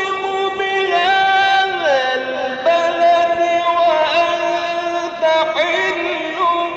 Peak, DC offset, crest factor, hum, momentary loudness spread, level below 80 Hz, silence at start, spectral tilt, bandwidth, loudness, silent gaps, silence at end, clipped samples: -4 dBFS; under 0.1%; 12 dB; none; 7 LU; -58 dBFS; 0 s; -2.5 dB/octave; 8 kHz; -16 LUFS; none; 0 s; under 0.1%